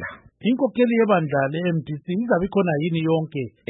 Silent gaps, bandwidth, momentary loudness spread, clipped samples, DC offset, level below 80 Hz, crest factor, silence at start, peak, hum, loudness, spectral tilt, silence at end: none; 4 kHz; 8 LU; under 0.1%; under 0.1%; -56 dBFS; 16 dB; 0 s; -6 dBFS; none; -22 LUFS; -12 dB/octave; 0.2 s